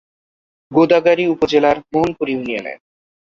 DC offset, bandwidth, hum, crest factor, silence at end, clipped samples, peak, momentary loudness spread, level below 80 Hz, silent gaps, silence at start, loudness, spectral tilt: under 0.1%; 7.4 kHz; none; 16 dB; 0.6 s; under 0.1%; -2 dBFS; 11 LU; -52 dBFS; none; 0.7 s; -16 LUFS; -6.5 dB/octave